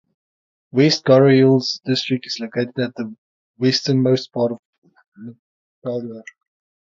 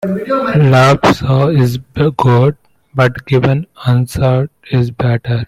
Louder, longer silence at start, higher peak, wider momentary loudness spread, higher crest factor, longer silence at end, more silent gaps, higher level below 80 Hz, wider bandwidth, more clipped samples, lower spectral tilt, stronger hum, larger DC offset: second, -18 LUFS vs -13 LUFS; first, 0.75 s vs 0 s; about the same, -2 dBFS vs 0 dBFS; first, 21 LU vs 8 LU; first, 18 dB vs 12 dB; first, 0.6 s vs 0 s; first, 3.18-3.54 s, 4.59-4.82 s, 5.08-5.12 s, 5.39-5.82 s vs none; second, -66 dBFS vs -40 dBFS; second, 7.6 kHz vs 13.5 kHz; neither; second, -6 dB/octave vs -7.5 dB/octave; neither; neither